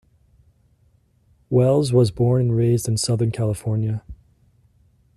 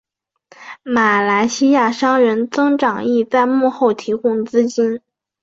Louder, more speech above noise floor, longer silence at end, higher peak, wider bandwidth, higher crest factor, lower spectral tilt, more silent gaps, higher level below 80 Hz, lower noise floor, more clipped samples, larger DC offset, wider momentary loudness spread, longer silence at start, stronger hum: second, -20 LUFS vs -16 LUFS; first, 41 dB vs 37 dB; first, 1.05 s vs 0.45 s; second, -6 dBFS vs -2 dBFS; first, 14 kHz vs 7.8 kHz; about the same, 16 dB vs 14 dB; first, -7 dB/octave vs -4.5 dB/octave; neither; first, -50 dBFS vs -62 dBFS; first, -60 dBFS vs -52 dBFS; neither; neither; about the same, 7 LU vs 6 LU; first, 1.5 s vs 0.6 s; neither